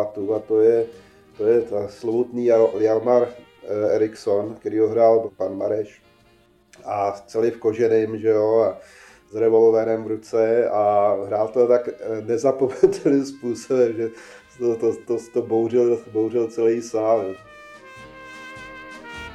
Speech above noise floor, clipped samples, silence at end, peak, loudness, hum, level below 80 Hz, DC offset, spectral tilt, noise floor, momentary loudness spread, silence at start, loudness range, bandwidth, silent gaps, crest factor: 36 dB; under 0.1%; 0 s; -2 dBFS; -21 LUFS; none; -62 dBFS; under 0.1%; -7 dB/octave; -57 dBFS; 18 LU; 0 s; 3 LU; 9.6 kHz; none; 18 dB